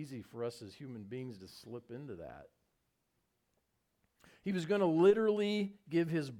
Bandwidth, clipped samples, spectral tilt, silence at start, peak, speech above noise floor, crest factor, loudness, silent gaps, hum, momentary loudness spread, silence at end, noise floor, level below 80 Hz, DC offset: 13 kHz; under 0.1%; -7 dB/octave; 0 s; -16 dBFS; 46 dB; 20 dB; -34 LUFS; none; none; 21 LU; 0 s; -82 dBFS; -74 dBFS; under 0.1%